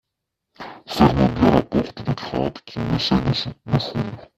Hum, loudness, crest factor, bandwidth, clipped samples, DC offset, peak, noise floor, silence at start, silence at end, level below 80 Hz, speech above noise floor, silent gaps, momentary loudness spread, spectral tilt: none; -21 LUFS; 22 dB; 14 kHz; under 0.1%; under 0.1%; 0 dBFS; -80 dBFS; 0.6 s; 0.15 s; -40 dBFS; 57 dB; none; 13 LU; -7 dB/octave